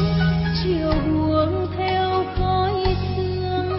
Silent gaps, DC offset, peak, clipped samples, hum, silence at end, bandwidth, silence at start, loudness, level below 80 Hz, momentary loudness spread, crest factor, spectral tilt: none; under 0.1%; -6 dBFS; under 0.1%; none; 0 s; 5.8 kHz; 0 s; -21 LUFS; -32 dBFS; 4 LU; 14 dB; -10.5 dB/octave